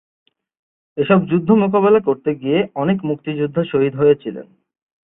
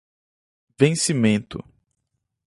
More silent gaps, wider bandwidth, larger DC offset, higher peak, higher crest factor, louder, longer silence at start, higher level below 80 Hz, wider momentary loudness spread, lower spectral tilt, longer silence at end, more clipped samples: neither; second, 3.9 kHz vs 11.5 kHz; neither; about the same, -2 dBFS vs -2 dBFS; second, 16 dB vs 22 dB; first, -17 LUFS vs -20 LUFS; first, 0.95 s vs 0.8 s; about the same, -58 dBFS vs -56 dBFS; second, 9 LU vs 18 LU; first, -12.5 dB/octave vs -5 dB/octave; second, 0.7 s vs 0.85 s; neither